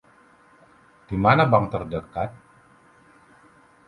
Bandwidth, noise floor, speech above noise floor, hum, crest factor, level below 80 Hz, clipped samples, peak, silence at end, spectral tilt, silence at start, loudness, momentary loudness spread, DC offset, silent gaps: 11 kHz; -55 dBFS; 34 dB; none; 24 dB; -50 dBFS; under 0.1%; -2 dBFS; 1.5 s; -8.5 dB/octave; 1.1 s; -22 LUFS; 14 LU; under 0.1%; none